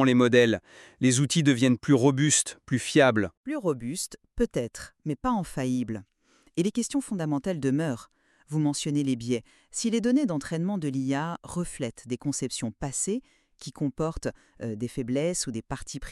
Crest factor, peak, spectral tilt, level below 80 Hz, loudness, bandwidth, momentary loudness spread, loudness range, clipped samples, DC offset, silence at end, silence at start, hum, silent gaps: 20 dB; -6 dBFS; -5 dB/octave; -52 dBFS; -27 LUFS; 13 kHz; 14 LU; 8 LU; under 0.1%; under 0.1%; 0 s; 0 s; none; 3.37-3.44 s